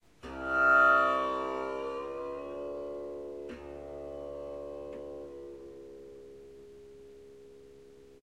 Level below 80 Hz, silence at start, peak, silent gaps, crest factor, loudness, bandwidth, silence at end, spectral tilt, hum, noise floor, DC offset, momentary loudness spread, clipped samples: -60 dBFS; 0.25 s; -14 dBFS; none; 20 dB; -30 LUFS; 10.5 kHz; 0.05 s; -5 dB/octave; none; -55 dBFS; under 0.1%; 28 LU; under 0.1%